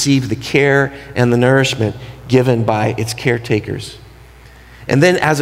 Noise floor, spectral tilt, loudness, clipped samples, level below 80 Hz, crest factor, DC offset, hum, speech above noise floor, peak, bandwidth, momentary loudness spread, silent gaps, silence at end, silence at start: -40 dBFS; -5.5 dB/octave; -15 LUFS; under 0.1%; -44 dBFS; 14 dB; under 0.1%; none; 26 dB; 0 dBFS; 15.5 kHz; 12 LU; none; 0 s; 0 s